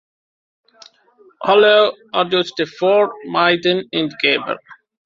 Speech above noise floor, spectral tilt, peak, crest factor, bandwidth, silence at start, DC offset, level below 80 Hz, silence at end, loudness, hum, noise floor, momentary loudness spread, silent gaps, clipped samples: 36 dB; -5 dB/octave; -2 dBFS; 16 dB; 7.4 kHz; 1.4 s; under 0.1%; -64 dBFS; 0.3 s; -16 LUFS; none; -52 dBFS; 10 LU; none; under 0.1%